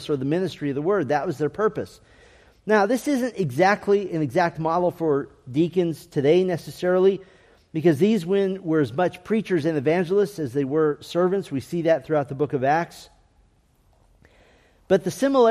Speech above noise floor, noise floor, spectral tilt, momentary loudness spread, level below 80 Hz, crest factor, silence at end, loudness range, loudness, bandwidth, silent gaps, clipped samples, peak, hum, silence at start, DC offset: 39 dB; -61 dBFS; -6.5 dB/octave; 7 LU; -60 dBFS; 16 dB; 0 s; 3 LU; -23 LUFS; 15 kHz; none; under 0.1%; -6 dBFS; none; 0 s; under 0.1%